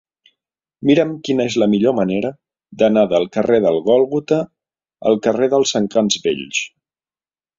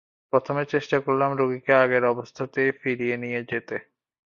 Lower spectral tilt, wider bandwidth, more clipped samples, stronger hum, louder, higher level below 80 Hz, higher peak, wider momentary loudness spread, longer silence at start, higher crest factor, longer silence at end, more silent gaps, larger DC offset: second, -5 dB/octave vs -7 dB/octave; first, 7.8 kHz vs 7 kHz; neither; neither; first, -17 LUFS vs -24 LUFS; first, -58 dBFS vs -66 dBFS; first, 0 dBFS vs -4 dBFS; about the same, 8 LU vs 10 LU; first, 0.8 s vs 0.35 s; about the same, 16 dB vs 20 dB; first, 0.9 s vs 0.5 s; neither; neither